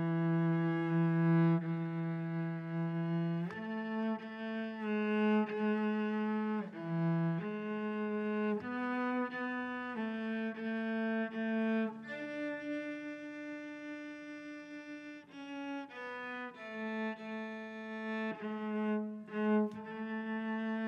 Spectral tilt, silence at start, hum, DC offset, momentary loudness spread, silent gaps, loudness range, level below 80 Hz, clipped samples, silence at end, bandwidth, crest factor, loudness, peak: -9 dB/octave; 0 s; none; under 0.1%; 12 LU; none; 9 LU; -88 dBFS; under 0.1%; 0 s; 6 kHz; 14 dB; -37 LUFS; -22 dBFS